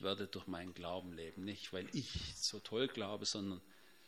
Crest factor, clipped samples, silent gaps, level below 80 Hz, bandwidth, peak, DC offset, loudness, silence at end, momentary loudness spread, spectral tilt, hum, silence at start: 22 dB; under 0.1%; none; -64 dBFS; 16 kHz; -22 dBFS; under 0.1%; -43 LUFS; 0 s; 8 LU; -3.5 dB/octave; none; 0 s